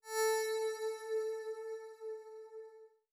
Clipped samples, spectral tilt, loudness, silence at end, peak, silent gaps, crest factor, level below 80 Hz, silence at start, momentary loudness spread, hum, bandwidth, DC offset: under 0.1%; 3 dB/octave; -39 LUFS; 0.25 s; -26 dBFS; none; 14 dB; under -90 dBFS; 0.05 s; 18 LU; none; over 20 kHz; under 0.1%